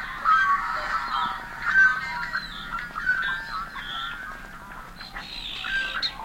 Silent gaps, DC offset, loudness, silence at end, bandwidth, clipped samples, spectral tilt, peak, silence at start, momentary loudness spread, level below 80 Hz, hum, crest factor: none; under 0.1%; -25 LUFS; 0 s; 16.5 kHz; under 0.1%; -2 dB/octave; -10 dBFS; 0 s; 18 LU; -46 dBFS; none; 18 dB